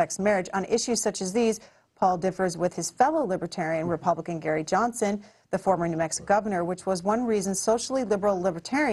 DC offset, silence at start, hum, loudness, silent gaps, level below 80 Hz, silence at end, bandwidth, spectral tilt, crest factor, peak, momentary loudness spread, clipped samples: under 0.1%; 0 s; none; -26 LUFS; none; -60 dBFS; 0 s; 12.5 kHz; -4.5 dB/octave; 18 dB; -8 dBFS; 4 LU; under 0.1%